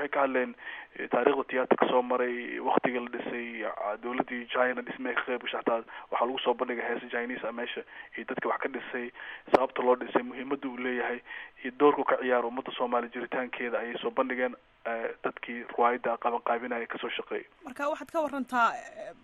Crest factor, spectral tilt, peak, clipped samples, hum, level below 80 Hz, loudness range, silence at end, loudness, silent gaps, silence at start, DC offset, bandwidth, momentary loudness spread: 26 dB; -5 dB/octave; -6 dBFS; under 0.1%; none; -70 dBFS; 3 LU; 0.1 s; -30 LUFS; none; 0 s; under 0.1%; 12 kHz; 11 LU